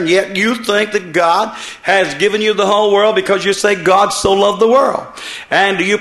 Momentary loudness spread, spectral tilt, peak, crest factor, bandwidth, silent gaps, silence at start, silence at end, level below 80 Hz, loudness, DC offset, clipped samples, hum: 6 LU; -3.5 dB/octave; 0 dBFS; 14 dB; 12.5 kHz; none; 0 s; 0 s; -48 dBFS; -13 LUFS; under 0.1%; under 0.1%; none